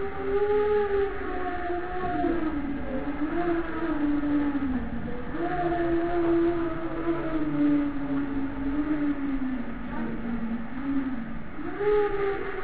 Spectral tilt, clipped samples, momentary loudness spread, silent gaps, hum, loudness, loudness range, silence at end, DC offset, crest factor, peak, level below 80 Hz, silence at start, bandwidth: -11 dB/octave; under 0.1%; 8 LU; none; none; -28 LUFS; 3 LU; 0 s; 2%; 14 dB; -14 dBFS; -42 dBFS; 0 s; 4 kHz